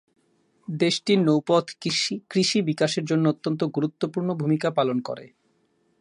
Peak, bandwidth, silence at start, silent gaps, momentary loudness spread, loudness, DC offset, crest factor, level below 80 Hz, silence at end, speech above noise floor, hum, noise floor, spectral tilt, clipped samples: -6 dBFS; 11.5 kHz; 0.7 s; none; 7 LU; -24 LUFS; under 0.1%; 18 dB; -72 dBFS; 0.75 s; 44 dB; none; -67 dBFS; -5 dB/octave; under 0.1%